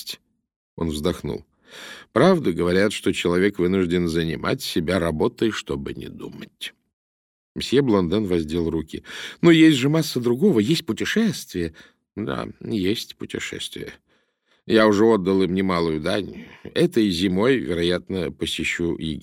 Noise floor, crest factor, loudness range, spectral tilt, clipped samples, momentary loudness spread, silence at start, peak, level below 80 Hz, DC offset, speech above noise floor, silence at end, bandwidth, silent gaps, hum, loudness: -66 dBFS; 18 dB; 6 LU; -5.5 dB/octave; under 0.1%; 17 LU; 0 s; -4 dBFS; -48 dBFS; under 0.1%; 45 dB; 0 s; 16.5 kHz; 0.56-0.77 s, 6.93-7.55 s; none; -21 LUFS